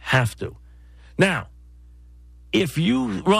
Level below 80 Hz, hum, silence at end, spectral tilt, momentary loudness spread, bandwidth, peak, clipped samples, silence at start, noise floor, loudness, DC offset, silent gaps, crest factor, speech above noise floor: -46 dBFS; 60 Hz at -45 dBFS; 0 s; -5.5 dB/octave; 14 LU; 15.5 kHz; -6 dBFS; under 0.1%; 0 s; -46 dBFS; -22 LUFS; under 0.1%; none; 18 dB; 26 dB